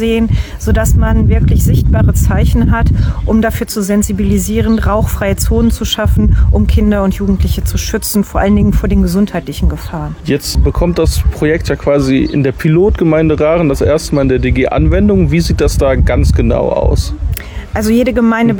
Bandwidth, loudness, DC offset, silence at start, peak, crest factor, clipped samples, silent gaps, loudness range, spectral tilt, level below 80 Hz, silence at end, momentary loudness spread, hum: over 20 kHz; -12 LUFS; under 0.1%; 0 s; -2 dBFS; 8 dB; under 0.1%; none; 2 LU; -6.5 dB/octave; -16 dBFS; 0 s; 6 LU; none